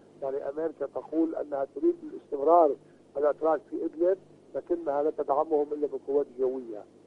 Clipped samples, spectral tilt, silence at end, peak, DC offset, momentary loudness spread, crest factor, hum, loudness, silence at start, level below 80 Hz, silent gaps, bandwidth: under 0.1%; -8.5 dB/octave; 0.25 s; -8 dBFS; under 0.1%; 14 LU; 20 dB; 50 Hz at -65 dBFS; -29 LUFS; 0.2 s; -72 dBFS; none; 5.2 kHz